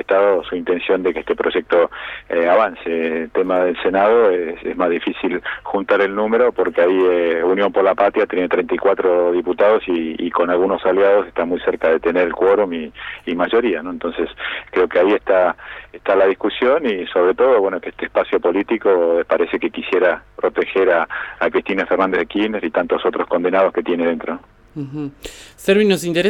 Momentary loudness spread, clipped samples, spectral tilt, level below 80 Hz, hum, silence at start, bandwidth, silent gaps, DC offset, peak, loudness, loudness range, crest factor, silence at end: 9 LU; under 0.1%; -5.5 dB/octave; -50 dBFS; none; 0.1 s; 13 kHz; none; under 0.1%; -2 dBFS; -17 LUFS; 3 LU; 16 dB; 0 s